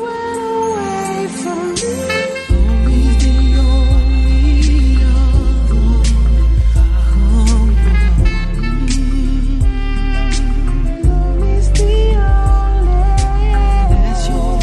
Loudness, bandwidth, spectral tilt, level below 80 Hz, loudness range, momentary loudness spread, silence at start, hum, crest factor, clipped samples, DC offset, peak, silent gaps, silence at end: -15 LUFS; 10.5 kHz; -6 dB/octave; -12 dBFS; 4 LU; 6 LU; 0 s; none; 10 dB; under 0.1%; under 0.1%; -2 dBFS; none; 0 s